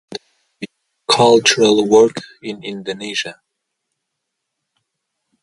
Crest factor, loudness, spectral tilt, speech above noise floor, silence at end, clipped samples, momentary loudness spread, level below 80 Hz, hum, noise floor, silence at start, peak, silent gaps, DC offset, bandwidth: 18 dB; -14 LUFS; -3 dB/octave; 62 dB; 2.1 s; under 0.1%; 23 LU; -62 dBFS; none; -77 dBFS; 0.1 s; 0 dBFS; none; under 0.1%; 11.5 kHz